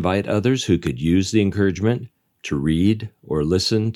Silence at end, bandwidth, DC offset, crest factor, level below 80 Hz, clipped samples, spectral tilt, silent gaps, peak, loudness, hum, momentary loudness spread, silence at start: 0 s; 13 kHz; under 0.1%; 16 dB; -44 dBFS; under 0.1%; -6 dB/octave; none; -4 dBFS; -20 LUFS; none; 8 LU; 0 s